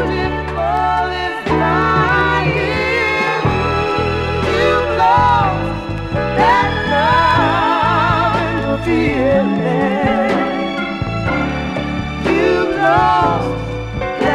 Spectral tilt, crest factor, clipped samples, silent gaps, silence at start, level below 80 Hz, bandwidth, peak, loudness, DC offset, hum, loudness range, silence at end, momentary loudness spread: -6.5 dB/octave; 14 dB; under 0.1%; none; 0 s; -30 dBFS; 13.5 kHz; 0 dBFS; -15 LUFS; under 0.1%; none; 3 LU; 0 s; 8 LU